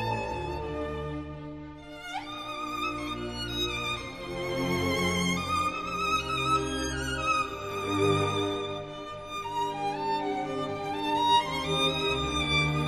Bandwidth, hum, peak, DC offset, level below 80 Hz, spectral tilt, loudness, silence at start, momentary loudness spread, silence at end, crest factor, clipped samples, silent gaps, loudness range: 13 kHz; none; -12 dBFS; under 0.1%; -46 dBFS; -4.5 dB/octave; -29 LUFS; 0 s; 11 LU; 0 s; 18 dB; under 0.1%; none; 6 LU